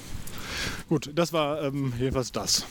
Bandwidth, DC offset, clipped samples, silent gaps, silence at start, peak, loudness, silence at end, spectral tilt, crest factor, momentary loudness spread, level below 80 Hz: 19.5 kHz; under 0.1%; under 0.1%; none; 0 s; -10 dBFS; -28 LUFS; 0 s; -4 dB/octave; 18 dB; 9 LU; -44 dBFS